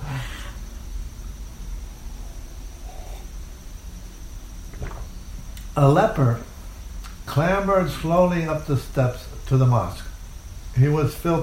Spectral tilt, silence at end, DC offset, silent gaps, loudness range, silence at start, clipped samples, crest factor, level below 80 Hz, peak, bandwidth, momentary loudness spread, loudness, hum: -7 dB/octave; 0 s; under 0.1%; none; 17 LU; 0 s; under 0.1%; 20 dB; -36 dBFS; -4 dBFS; 16 kHz; 21 LU; -21 LUFS; none